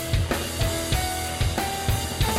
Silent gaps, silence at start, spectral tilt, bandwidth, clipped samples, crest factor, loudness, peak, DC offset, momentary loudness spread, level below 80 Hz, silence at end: none; 0 s; -4 dB/octave; 16 kHz; under 0.1%; 12 dB; -25 LUFS; -12 dBFS; under 0.1%; 1 LU; -32 dBFS; 0 s